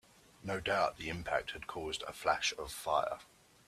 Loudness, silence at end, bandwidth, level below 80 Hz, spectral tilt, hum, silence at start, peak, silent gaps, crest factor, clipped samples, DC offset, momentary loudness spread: -36 LUFS; 0.45 s; 15.5 kHz; -60 dBFS; -3 dB/octave; none; 0.45 s; -16 dBFS; none; 20 dB; under 0.1%; under 0.1%; 10 LU